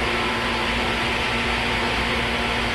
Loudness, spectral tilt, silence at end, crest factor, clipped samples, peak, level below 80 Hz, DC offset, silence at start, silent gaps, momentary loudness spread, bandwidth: -21 LUFS; -4 dB/octave; 0 s; 14 dB; under 0.1%; -10 dBFS; -34 dBFS; under 0.1%; 0 s; none; 1 LU; 14 kHz